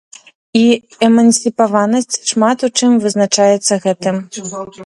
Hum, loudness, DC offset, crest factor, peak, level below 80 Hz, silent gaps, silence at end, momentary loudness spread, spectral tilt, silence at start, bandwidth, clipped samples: none; -13 LUFS; under 0.1%; 14 dB; 0 dBFS; -62 dBFS; none; 0 s; 9 LU; -4 dB/octave; 0.55 s; 11.5 kHz; under 0.1%